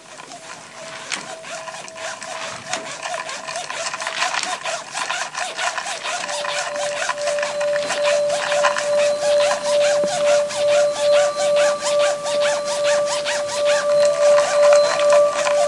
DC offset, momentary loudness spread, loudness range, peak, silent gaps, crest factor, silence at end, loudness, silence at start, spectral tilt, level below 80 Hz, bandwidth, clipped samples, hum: under 0.1%; 14 LU; 10 LU; -2 dBFS; none; 18 dB; 0 s; -19 LUFS; 0 s; -0.5 dB/octave; -72 dBFS; 11.5 kHz; under 0.1%; none